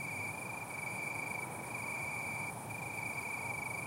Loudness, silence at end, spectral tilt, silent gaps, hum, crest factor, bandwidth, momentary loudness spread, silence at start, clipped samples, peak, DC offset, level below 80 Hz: -39 LUFS; 0 s; -3.5 dB/octave; none; none; 14 dB; 16 kHz; 3 LU; 0 s; under 0.1%; -28 dBFS; under 0.1%; -70 dBFS